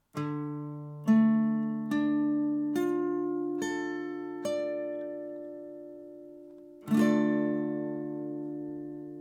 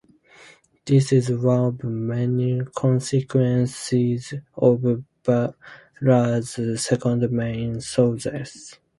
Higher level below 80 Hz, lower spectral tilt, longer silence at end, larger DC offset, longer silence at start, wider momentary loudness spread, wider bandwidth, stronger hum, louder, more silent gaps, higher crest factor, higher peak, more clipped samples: second, -78 dBFS vs -56 dBFS; about the same, -7 dB/octave vs -7 dB/octave; second, 0 s vs 0.25 s; neither; second, 0.15 s vs 0.85 s; first, 19 LU vs 10 LU; first, 14 kHz vs 11.5 kHz; neither; second, -31 LUFS vs -22 LUFS; neither; about the same, 18 dB vs 18 dB; second, -14 dBFS vs -4 dBFS; neither